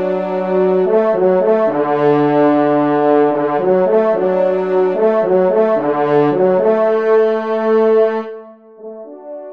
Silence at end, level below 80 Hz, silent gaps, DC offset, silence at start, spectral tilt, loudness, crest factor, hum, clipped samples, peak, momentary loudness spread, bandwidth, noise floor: 0 s; -66 dBFS; none; 0.4%; 0 s; -9 dB/octave; -14 LUFS; 12 dB; none; under 0.1%; -2 dBFS; 6 LU; 5.4 kHz; -36 dBFS